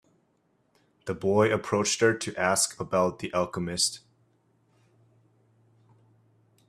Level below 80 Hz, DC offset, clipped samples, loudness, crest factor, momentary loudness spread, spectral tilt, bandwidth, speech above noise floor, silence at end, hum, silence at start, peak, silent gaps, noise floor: -66 dBFS; under 0.1%; under 0.1%; -26 LUFS; 22 dB; 7 LU; -3.5 dB/octave; 14.5 kHz; 44 dB; 2.7 s; none; 1.05 s; -8 dBFS; none; -70 dBFS